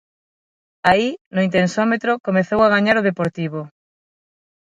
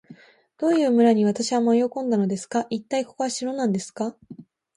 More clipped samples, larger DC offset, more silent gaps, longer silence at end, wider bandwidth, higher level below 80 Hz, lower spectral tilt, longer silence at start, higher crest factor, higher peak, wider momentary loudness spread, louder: neither; neither; first, 1.21-1.31 s, 2.20-2.24 s vs none; first, 1.1 s vs 0.35 s; about the same, 10.5 kHz vs 11.5 kHz; first, -54 dBFS vs -72 dBFS; about the same, -6 dB/octave vs -5.5 dB/octave; first, 0.85 s vs 0.1 s; about the same, 18 dB vs 16 dB; first, 0 dBFS vs -8 dBFS; about the same, 11 LU vs 10 LU; first, -18 LUFS vs -23 LUFS